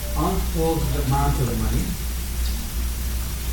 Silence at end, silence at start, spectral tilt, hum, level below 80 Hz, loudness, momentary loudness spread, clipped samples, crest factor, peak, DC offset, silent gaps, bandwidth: 0 s; 0 s; -5.5 dB/octave; 60 Hz at -30 dBFS; -26 dBFS; -24 LUFS; 6 LU; under 0.1%; 14 dB; -10 dBFS; under 0.1%; none; 17.5 kHz